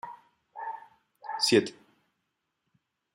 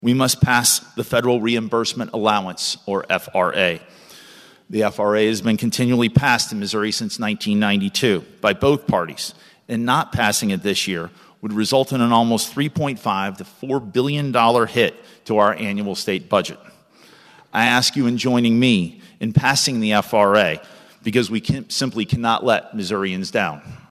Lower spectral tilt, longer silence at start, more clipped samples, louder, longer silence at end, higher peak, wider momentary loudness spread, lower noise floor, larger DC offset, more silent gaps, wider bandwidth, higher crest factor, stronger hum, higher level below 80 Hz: about the same, -3.5 dB/octave vs -4 dB/octave; about the same, 0.05 s vs 0 s; neither; second, -28 LUFS vs -19 LUFS; first, 1.4 s vs 0.15 s; second, -10 dBFS vs -2 dBFS; first, 22 LU vs 9 LU; first, -81 dBFS vs -50 dBFS; neither; neither; about the same, 15.5 kHz vs 14.5 kHz; first, 24 dB vs 18 dB; neither; second, -82 dBFS vs -52 dBFS